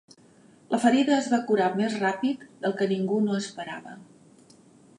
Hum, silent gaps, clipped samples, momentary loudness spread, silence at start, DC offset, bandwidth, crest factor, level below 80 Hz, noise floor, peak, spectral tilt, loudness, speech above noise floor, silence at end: none; none; under 0.1%; 14 LU; 0.7 s; under 0.1%; 11.5 kHz; 18 dB; -78 dBFS; -56 dBFS; -8 dBFS; -5.5 dB/octave; -25 LUFS; 31 dB; 0.95 s